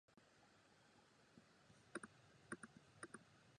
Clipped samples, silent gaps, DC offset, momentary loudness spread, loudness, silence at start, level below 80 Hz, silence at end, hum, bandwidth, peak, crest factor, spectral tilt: under 0.1%; none; under 0.1%; 7 LU; -59 LUFS; 0.1 s; -88 dBFS; 0 s; none; 10 kHz; -34 dBFS; 28 dB; -3.5 dB/octave